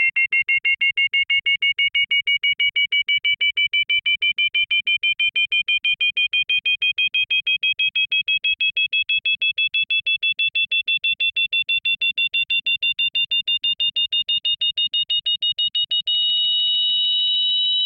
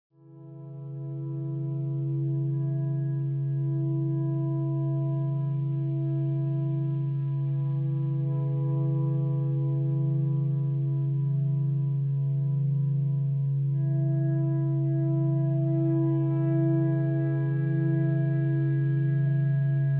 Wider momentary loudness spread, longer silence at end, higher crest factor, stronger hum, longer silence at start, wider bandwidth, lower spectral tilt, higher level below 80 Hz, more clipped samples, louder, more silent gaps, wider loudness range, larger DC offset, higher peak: about the same, 3 LU vs 4 LU; about the same, 0 s vs 0 s; about the same, 10 dB vs 10 dB; second, none vs 50 Hz at -70 dBFS; second, 0 s vs 0.3 s; first, 5.4 kHz vs 2.1 kHz; second, 0 dB/octave vs -13.5 dB/octave; first, -64 dBFS vs -74 dBFS; neither; first, -17 LUFS vs -27 LUFS; neither; about the same, 1 LU vs 3 LU; neither; first, -10 dBFS vs -16 dBFS